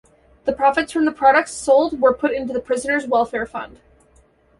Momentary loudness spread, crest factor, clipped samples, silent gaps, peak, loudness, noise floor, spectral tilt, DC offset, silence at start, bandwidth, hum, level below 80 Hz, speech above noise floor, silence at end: 11 LU; 18 dB; under 0.1%; none; -2 dBFS; -19 LUFS; -55 dBFS; -3.5 dB/octave; under 0.1%; 0.45 s; 11.5 kHz; none; -52 dBFS; 37 dB; 0.95 s